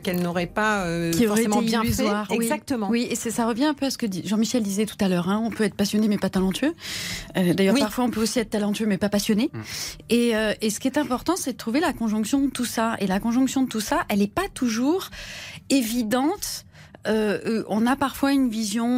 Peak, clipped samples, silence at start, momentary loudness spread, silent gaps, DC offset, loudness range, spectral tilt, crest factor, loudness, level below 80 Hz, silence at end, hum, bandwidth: -10 dBFS; under 0.1%; 0 s; 5 LU; none; under 0.1%; 2 LU; -4.5 dB/octave; 14 dB; -24 LUFS; -48 dBFS; 0 s; none; 16 kHz